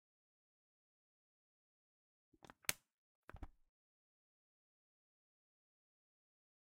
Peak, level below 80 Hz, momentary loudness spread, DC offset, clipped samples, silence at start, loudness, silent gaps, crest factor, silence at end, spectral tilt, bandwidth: -18 dBFS; -72 dBFS; 22 LU; under 0.1%; under 0.1%; 2.7 s; -45 LUFS; 2.93-3.28 s; 42 dB; 3.25 s; -1 dB/octave; 6.8 kHz